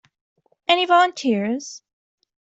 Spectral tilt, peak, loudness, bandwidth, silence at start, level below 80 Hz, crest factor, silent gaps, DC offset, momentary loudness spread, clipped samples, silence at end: -3.5 dB/octave; -4 dBFS; -19 LUFS; 8.2 kHz; 0.7 s; -72 dBFS; 18 dB; none; under 0.1%; 14 LU; under 0.1%; 0.75 s